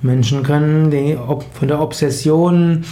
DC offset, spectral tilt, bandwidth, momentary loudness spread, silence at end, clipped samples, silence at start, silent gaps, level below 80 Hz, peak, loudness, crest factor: under 0.1%; -7 dB/octave; 15 kHz; 7 LU; 0 s; under 0.1%; 0 s; none; -46 dBFS; -4 dBFS; -15 LUFS; 10 dB